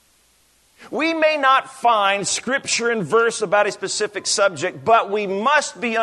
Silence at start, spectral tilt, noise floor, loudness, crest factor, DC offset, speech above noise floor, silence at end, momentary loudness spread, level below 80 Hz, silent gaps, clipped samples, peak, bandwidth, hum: 0.8 s; -2 dB/octave; -58 dBFS; -19 LUFS; 16 dB; under 0.1%; 39 dB; 0 s; 6 LU; -68 dBFS; none; under 0.1%; -4 dBFS; 12.5 kHz; none